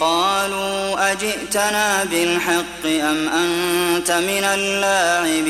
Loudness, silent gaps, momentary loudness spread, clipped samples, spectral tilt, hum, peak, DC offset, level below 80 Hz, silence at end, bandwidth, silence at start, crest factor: -18 LUFS; none; 4 LU; under 0.1%; -2 dB/octave; none; -4 dBFS; under 0.1%; -50 dBFS; 0 s; 16 kHz; 0 s; 14 dB